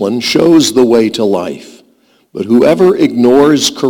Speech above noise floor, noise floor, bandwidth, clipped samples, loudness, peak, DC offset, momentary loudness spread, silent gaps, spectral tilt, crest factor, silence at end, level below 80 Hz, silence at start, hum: 42 dB; -51 dBFS; 18.5 kHz; under 0.1%; -9 LUFS; 0 dBFS; under 0.1%; 15 LU; none; -4.5 dB/octave; 10 dB; 0 s; -48 dBFS; 0 s; none